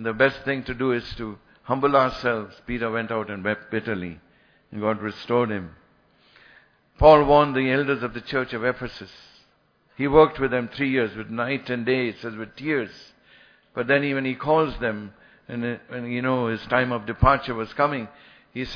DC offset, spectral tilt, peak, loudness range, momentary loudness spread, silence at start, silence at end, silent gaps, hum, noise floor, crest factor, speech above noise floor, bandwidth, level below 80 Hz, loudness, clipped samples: under 0.1%; -8 dB/octave; -2 dBFS; 7 LU; 16 LU; 0 s; 0 s; none; none; -63 dBFS; 22 dB; 40 dB; 5.4 kHz; -42 dBFS; -23 LUFS; under 0.1%